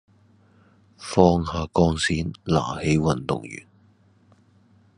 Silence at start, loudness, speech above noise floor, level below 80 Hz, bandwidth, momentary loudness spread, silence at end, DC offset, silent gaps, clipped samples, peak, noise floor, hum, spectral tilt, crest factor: 1 s; -22 LUFS; 36 dB; -48 dBFS; 10.5 kHz; 13 LU; 1.4 s; under 0.1%; none; under 0.1%; -2 dBFS; -58 dBFS; none; -6 dB/octave; 24 dB